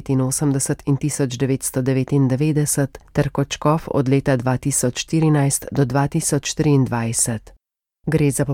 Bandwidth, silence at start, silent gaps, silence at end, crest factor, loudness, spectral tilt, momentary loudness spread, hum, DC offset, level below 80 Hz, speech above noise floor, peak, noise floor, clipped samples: 17 kHz; 0 s; none; 0 s; 14 dB; -19 LUFS; -5.5 dB/octave; 4 LU; none; under 0.1%; -44 dBFS; 41 dB; -6 dBFS; -60 dBFS; under 0.1%